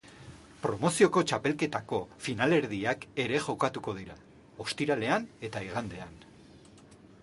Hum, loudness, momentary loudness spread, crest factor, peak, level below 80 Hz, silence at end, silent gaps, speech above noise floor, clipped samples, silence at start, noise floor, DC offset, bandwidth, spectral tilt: none; -30 LUFS; 17 LU; 22 dB; -10 dBFS; -62 dBFS; 0.3 s; none; 24 dB; under 0.1%; 0.05 s; -55 dBFS; under 0.1%; 11.5 kHz; -5 dB/octave